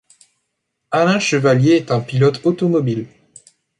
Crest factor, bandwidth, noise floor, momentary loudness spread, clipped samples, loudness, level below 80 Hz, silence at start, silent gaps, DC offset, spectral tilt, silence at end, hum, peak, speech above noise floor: 14 dB; 11 kHz; -74 dBFS; 8 LU; under 0.1%; -16 LUFS; -58 dBFS; 0.9 s; none; under 0.1%; -6 dB/octave; 0.75 s; none; -2 dBFS; 59 dB